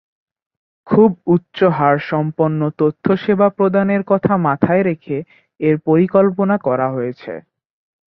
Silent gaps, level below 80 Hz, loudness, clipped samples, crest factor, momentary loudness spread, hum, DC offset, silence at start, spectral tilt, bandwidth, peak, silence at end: none; -54 dBFS; -16 LUFS; under 0.1%; 16 dB; 10 LU; none; under 0.1%; 0.85 s; -11 dB/octave; 5.6 kHz; 0 dBFS; 0.7 s